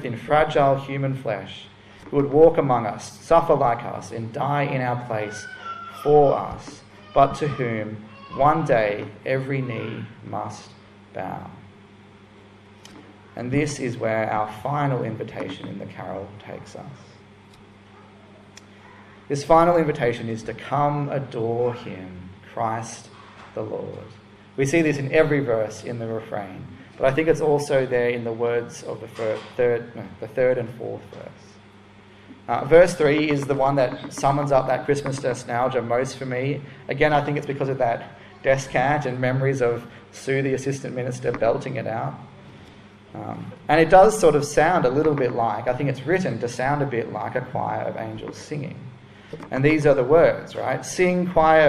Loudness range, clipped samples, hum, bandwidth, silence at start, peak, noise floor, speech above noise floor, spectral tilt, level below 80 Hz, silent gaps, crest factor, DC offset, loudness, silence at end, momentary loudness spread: 10 LU; under 0.1%; none; 13 kHz; 0 s; -2 dBFS; -48 dBFS; 26 dB; -6 dB/octave; -48 dBFS; none; 22 dB; under 0.1%; -22 LUFS; 0 s; 19 LU